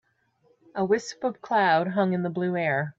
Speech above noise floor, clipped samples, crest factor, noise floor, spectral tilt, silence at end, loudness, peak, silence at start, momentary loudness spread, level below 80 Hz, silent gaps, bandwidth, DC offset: 41 dB; under 0.1%; 16 dB; -66 dBFS; -6 dB/octave; 0.1 s; -25 LUFS; -10 dBFS; 0.75 s; 10 LU; -72 dBFS; none; 7.8 kHz; under 0.1%